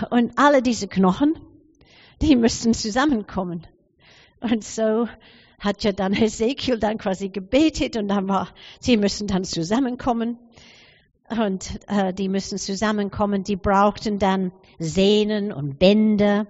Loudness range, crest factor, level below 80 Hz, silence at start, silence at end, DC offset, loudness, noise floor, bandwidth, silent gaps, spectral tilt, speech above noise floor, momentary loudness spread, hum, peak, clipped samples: 5 LU; 18 dB; -44 dBFS; 0 s; 0.05 s; under 0.1%; -22 LUFS; -54 dBFS; 8 kHz; none; -5 dB/octave; 33 dB; 11 LU; none; -4 dBFS; under 0.1%